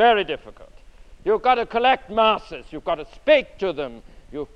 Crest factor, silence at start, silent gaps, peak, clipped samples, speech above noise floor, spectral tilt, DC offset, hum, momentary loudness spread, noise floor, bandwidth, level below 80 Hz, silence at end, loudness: 18 dB; 0 s; none; -4 dBFS; under 0.1%; 24 dB; -5 dB/octave; under 0.1%; none; 14 LU; -45 dBFS; 8.6 kHz; -46 dBFS; 0.1 s; -21 LUFS